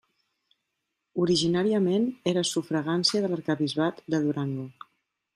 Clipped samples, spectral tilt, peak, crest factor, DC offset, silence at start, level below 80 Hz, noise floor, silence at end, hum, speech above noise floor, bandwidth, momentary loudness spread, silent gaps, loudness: under 0.1%; -5 dB/octave; -10 dBFS; 18 dB; under 0.1%; 1.15 s; -68 dBFS; -82 dBFS; 0.65 s; none; 56 dB; 13 kHz; 8 LU; none; -26 LUFS